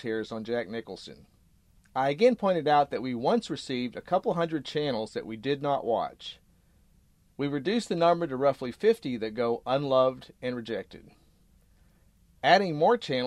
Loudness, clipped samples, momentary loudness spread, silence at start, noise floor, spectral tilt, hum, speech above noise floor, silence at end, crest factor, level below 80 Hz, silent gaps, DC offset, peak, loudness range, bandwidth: -28 LUFS; under 0.1%; 13 LU; 0 s; -63 dBFS; -6 dB/octave; none; 35 dB; 0 s; 22 dB; -64 dBFS; none; under 0.1%; -8 dBFS; 4 LU; 12.5 kHz